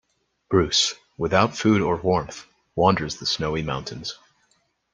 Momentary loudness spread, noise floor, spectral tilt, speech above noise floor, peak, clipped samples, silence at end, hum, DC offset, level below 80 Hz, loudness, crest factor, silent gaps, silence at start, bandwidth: 14 LU; -67 dBFS; -4.5 dB/octave; 45 dB; -2 dBFS; under 0.1%; 0.8 s; none; under 0.1%; -50 dBFS; -22 LUFS; 22 dB; none; 0.5 s; 10 kHz